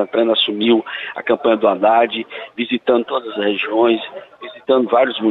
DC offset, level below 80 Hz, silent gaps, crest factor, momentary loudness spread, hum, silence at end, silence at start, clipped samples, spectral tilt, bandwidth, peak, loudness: under 0.1%; -66 dBFS; none; 14 dB; 12 LU; none; 0 s; 0 s; under 0.1%; -7 dB/octave; 4.2 kHz; -4 dBFS; -17 LUFS